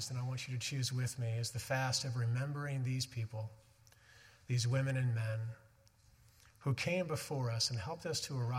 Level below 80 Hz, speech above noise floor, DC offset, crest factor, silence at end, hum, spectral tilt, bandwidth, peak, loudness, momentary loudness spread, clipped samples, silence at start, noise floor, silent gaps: -70 dBFS; 29 dB; under 0.1%; 16 dB; 0 s; none; -4.5 dB/octave; 15.5 kHz; -22 dBFS; -38 LUFS; 8 LU; under 0.1%; 0 s; -67 dBFS; none